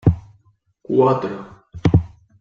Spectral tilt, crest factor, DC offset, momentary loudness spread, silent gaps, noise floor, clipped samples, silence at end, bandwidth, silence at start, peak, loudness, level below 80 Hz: -9.5 dB/octave; 18 dB; under 0.1%; 19 LU; none; -59 dBFS; under 0.1%; 0.35 s; 6.8 kHz; 0.05 s; -2 dBFS; -19 LUFS; -36 dBFS